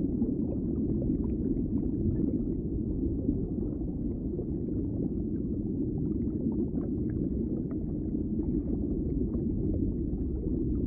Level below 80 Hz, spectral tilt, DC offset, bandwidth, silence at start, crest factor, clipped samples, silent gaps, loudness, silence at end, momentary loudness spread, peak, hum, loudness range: -38 dBFS; -16.5 dB/octave; under 0.1%; 2.1 kHz; 0 s; 16 dB; under 0.1%; none; -32 LUFS; 0 s; 3 LU; -14 dBFS; none; 2 LU